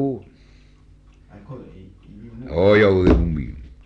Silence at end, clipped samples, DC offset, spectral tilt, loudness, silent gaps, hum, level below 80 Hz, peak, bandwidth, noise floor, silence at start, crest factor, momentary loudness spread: 0.2 s; under 0.1%; under 0.1%; -8.5 dB/octave; -17 LUFS; none; none; -32 dBFS; -4 dBFS; 7.4 kHz; -49 dBFS; 0 s; 18 dB; 25 LU